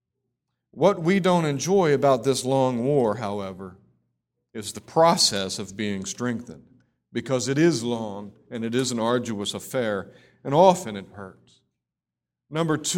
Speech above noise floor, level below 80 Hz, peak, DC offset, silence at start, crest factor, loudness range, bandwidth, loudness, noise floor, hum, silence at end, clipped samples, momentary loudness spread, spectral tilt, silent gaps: 64 dB; -64 dBFS; -2 dBFS; under 0.1%; 0.75 s; 22 dB; 4 LU; 17.5 kHz; -23 LUFS; -87 dBFS; none; 0 s; under 0.1%; 18 LU; -4.5 dB/octave; none